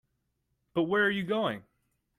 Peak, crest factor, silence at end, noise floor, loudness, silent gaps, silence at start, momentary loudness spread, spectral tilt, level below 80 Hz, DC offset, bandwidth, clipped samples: -14 dBFS; 18 dB; 0.55 s; -79 dBFS; -29 LUFS; none; 0.75 s; 9 LU; -6.5 dB/octave; -70 dBFS; under 0.1%; 14 kHz; under 0.1%